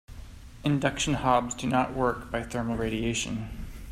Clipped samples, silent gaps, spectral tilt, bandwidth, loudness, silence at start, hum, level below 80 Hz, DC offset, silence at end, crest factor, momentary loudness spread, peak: under 0.1%; none; -5 dB/octave; 15 kHz; -28 LUFS; 0.1 s; none; -44 dBFS; under 0.1%; 0 s; 20 dB; 16 LU; -8 dBFS